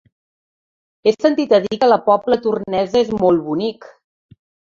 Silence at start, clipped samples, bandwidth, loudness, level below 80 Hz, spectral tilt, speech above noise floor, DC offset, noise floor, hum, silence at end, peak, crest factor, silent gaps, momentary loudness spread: 1.05 s; under 0.1%; 7.4 kHz; -17 LUFS; -54 dBFS; -6.5 dB/octave; over 74 dB; under 0.1%; under -90 dBFS; none; 0.8 s; 0 dBFS; 18 dB; none; 6 LU